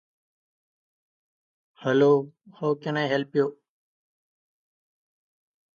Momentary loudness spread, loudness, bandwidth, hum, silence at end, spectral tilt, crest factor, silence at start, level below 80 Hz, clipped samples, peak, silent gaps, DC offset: 11 LU; -25 LUFS; 7 kHz; none; 2.2 s; -7 dB/octave; 20 dB; 1.8 s; -80 dBFS; under 0.1%; -8 dBFS; none; under 0.1%